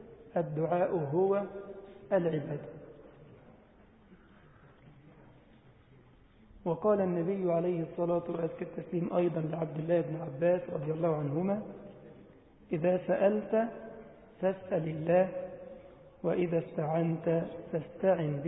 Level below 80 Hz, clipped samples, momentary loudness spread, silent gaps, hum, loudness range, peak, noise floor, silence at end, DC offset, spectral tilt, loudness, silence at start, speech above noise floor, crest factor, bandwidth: -66 dBFS; under 0.1%; 18 LU; none; none; 7 LU; -14 dBFS; -60 dBFS; 0 s; under 0.1%; -6 dB/octave; -32 LUFS; 0 s; 29 dB; 18 dB; 3.8 kHz